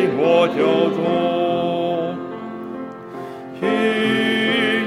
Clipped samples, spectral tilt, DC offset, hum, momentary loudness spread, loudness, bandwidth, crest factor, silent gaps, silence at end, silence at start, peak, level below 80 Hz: under 0.1%; -6 dB/octave; under 0.1%; none; 16 LU; -18 LUFS; 12.5 kHz; 16 dB; none; 0 s; 0 s; -4 dBFS; -60 dBFS